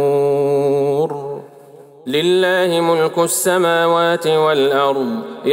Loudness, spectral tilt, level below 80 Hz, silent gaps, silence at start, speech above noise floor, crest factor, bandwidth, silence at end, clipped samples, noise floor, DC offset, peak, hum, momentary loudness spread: -16 LUFS; -4 dB/octave; -70 dBFS; none; 0 s; 26 dB; 12 dB; 16.5 kHz; 0 s; under 0.1%; -41 dBFS; under 0.1%; -4 dBFS; none; 8 LU